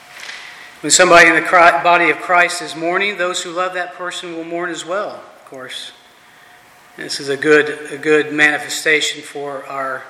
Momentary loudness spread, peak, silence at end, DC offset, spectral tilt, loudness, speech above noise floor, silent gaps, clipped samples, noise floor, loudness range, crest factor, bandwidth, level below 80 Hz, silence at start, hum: 20 LU; 0 dBFS; 0 s; under 0.1%; -2 dB/octave; -14 LUFS; 30 dB; none; under 0.1%; -45 dBFS; 14 LU; 16 dB; 15.5 kHz; -56 dBFS; 0.1 s; none